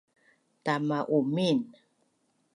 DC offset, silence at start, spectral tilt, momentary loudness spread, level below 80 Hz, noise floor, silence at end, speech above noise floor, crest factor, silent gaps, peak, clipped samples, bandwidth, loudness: under 0.1%; 0.65 s; -6.5 dB/octave; 9 LU; -80 dBFS; -73 dBFS; 0.85 s; 45 dB; 18 dB; none; -14 dBFS; under 0.1%; 11 kHz; -29 LUFS